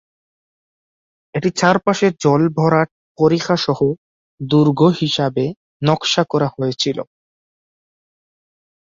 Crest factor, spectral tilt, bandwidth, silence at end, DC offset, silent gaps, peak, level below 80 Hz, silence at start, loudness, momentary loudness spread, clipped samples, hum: 18 dB; -5.5 dB/octave; 7.8 kHz; 1.8 s; under 0.1%; 2.91-3.15 s, 3.98-4.38 s, 5.57-5.80 s; -2 dBFS; -56 dBFS; 1.35 s; -17 LUFS; 10 LU; under 0.1%; none